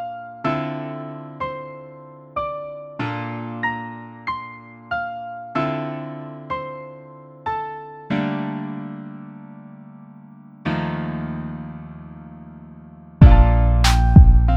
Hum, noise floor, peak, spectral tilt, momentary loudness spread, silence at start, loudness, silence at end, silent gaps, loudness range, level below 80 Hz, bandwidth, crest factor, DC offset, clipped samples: none; -43 dBFS; 0 dBFS; -7 dB/octave; 26 LU; 0 s; -21 LUFS; 0 s; none; 11 LU; -24 dBFS; 12 kHz; 20 dB; under 0.1%; under 0.1%